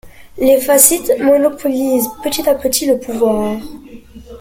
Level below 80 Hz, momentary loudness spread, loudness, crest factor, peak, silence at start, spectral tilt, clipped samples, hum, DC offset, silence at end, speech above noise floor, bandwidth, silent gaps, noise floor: -44 dBFS; 10 LU; -13 LUFS; 14 dB; 0 dBFS; 0.05 s; -2.5 dB/octave; 0.1%; none; under 0.1%; 0 s; 21 dB; 17 kHz; none; -35 dBFS